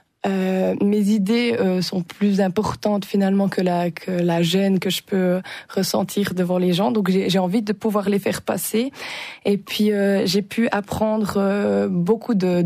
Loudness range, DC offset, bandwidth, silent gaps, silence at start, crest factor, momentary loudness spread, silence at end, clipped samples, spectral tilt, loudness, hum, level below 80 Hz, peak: 1 LU; under 0.1%; 15.5 kHz; none; 0.25 s; 12 dB; 5 LU; 0 s; under 0.1%; -6 dB/octave; -21 LUFS; none; -56 dBFS; -8 dBFS